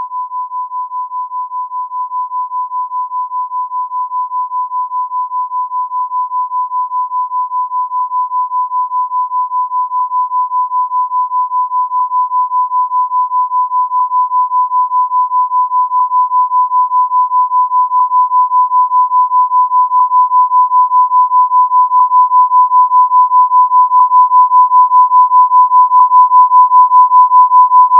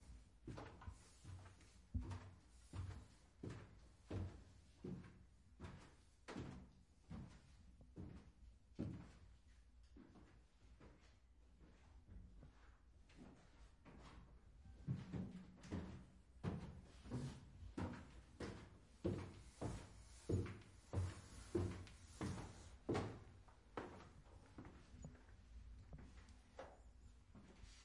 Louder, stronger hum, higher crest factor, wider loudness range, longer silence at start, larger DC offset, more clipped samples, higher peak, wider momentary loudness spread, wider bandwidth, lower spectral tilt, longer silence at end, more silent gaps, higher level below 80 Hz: first, -11 LUFS vs -54 LUFS; neither; second, 10 dB vs 24 dB; second, 11 LU vs 16 LU; about the same, 0 s vs 0 s; neither; neither; first, 0 dBFS vs -30 dBFS; second, 12 LU vs 19 LU; second, 1.2 kHz vs 11.5 kHz; second, 9 dB/octave vs -7 dB/octave; about the same, 0 s vs 0 s; neither; second, under -90 dBFS vs -64 dBFS